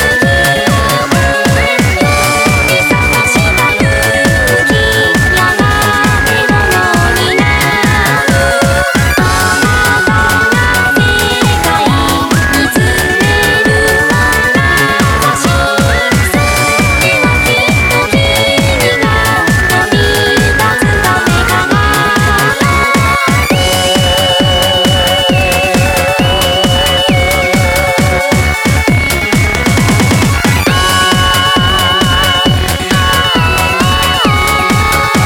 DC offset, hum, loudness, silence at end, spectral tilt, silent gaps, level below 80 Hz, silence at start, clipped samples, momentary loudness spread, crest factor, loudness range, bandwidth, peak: under 0.1%; none; -9 LUFS; 0 s; -4 dB/octave; none; -22 dBFS; 0 s; under 0.1%; 2 LU; 10 dB; 1 LU; 19 kHz; 0 dBFS